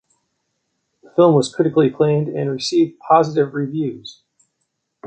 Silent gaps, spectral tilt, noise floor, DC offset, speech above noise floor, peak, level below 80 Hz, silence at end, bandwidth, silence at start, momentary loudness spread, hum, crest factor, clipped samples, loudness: none; -6.5 dB/octave; -73 dBFS; under 0.1%; 57 dB; -2 dBFS; -62 dBFS; 0 s; 9 kHz; 1.15 s; 10 LU; none; 16 dB; under 0.1%; -17 LUFS